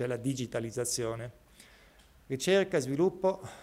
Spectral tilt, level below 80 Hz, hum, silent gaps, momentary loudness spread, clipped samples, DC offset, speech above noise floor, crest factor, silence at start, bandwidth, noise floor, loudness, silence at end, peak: -4.5 dB/octave; -62 dBFS; none; none; 11 LU; under 0.1%; under 0.1%; 28 dB; 18 dB; 0 s; 16 kHz; -59 dBFS; -31 LUFS; 0 s; -14 dBFS